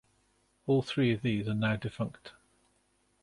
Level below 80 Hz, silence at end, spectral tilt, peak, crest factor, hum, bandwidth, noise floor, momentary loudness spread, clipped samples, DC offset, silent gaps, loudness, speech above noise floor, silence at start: -62 dBFS; 0.95 s; -7.5 dB/octave; -16 dBFS; 16 dB; none; 11.5 kHz; -72 dBFS; 11 LU; under 0.1%; under 0.1%; none; -31 LUFS; 42 dB; 0.65 s